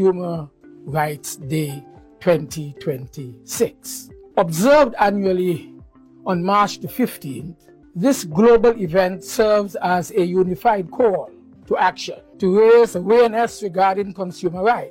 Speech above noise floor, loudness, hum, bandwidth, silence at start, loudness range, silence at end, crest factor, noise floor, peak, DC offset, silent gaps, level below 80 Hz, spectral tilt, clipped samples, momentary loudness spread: 27 dB; -19 LUFS; none; 16.5 kHz; 0 s; 7 LU; 0 s; 16 dB; -45 dBFS; -2 dBFS; under 0.1%; none; -50 dBFS; -5.5 dB/octave; under 0.1%; 17 LU